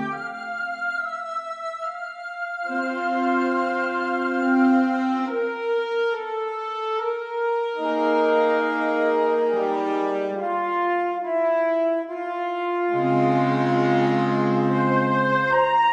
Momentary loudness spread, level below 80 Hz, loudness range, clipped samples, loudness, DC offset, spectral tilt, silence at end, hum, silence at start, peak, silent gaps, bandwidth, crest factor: 10 LU; -70 dBFS; 4 LU; under 0.1%; -23 LUFS; under 0.1%; -7.5 dB/octave; 0 s; none; 0 s; -8 dBFS; none; 8.8 kHz; 14 dB